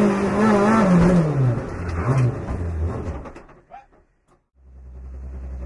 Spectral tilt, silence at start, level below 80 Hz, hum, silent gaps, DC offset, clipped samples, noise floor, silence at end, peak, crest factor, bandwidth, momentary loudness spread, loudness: -8 dB/octave; 0 s; -36 dBFS; none; none; under 0.1%; under 0.1%; -61 dBFS; 0 s; -6 dBFS; 16 dB; 11.5 kHz; 21 LU; -20 LUFS